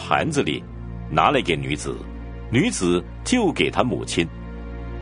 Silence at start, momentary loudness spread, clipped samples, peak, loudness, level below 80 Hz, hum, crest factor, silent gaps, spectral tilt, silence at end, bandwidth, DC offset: 0 s; 16 LU; under 0.1%; 0 dBFS; -22 LUFS; -38 dBFS; none; 22 dB; none; -4.5 dB/octave; 0 s; 10.5 kHz; under 0.1%